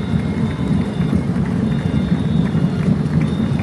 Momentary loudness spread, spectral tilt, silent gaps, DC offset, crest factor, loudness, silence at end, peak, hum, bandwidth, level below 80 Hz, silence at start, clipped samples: 2 LU; -8.5 dB/octave; none; under 0.1%; 14 dB; -18 LUFS; 0 s; -4 dBFS; none; 11.5 kHz; -32 dBFS; 0 s; under 0.1%